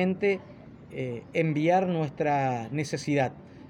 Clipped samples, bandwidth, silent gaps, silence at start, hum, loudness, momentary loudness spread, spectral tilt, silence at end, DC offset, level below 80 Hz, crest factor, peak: under 0.1%; 11 kHz; none; 0 s; none; -28 LUFS; 11 LU; -6.5 dB/octave; 0 s; under 0.1%; -64 dBFS; 18 dB; -10 dBFS